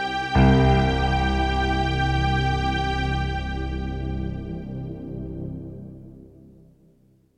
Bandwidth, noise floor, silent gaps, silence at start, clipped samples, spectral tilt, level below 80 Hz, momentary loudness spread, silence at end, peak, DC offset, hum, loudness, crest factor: 9 kHz; -58 dBFS; none; 0 s; under 0.1%; -7 dB/octave; -30 dBFS; 16 LU; 1.1 s; -6 dBFS; under 0.1%; none; -23 LUFS; 18 dB